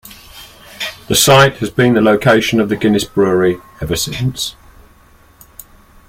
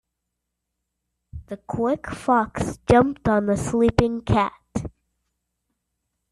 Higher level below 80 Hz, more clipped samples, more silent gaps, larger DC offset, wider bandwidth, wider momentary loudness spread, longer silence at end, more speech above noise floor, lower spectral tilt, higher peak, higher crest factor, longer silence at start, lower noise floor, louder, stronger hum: about the same, -40 dBFS vs -44 dBFS; neither; neither; neither; first, 16.5 kHz vs 12 kHz; about the same, 15 LU vs 14 LU; about the same, 1.55 s vs 1.45 s; second, 33 dB vs 60 dB; second, -4.5 dB/octave vs -6.5 dB/octave; about the same, 0 dBFS vs -2 dBFS; second, 14 dB vs 22 dB; second, 0.05 s vs 1.35 s; second, -46 dBFS vs -81 dBFS; first, -13 LUFS vs -22 LUFS; neither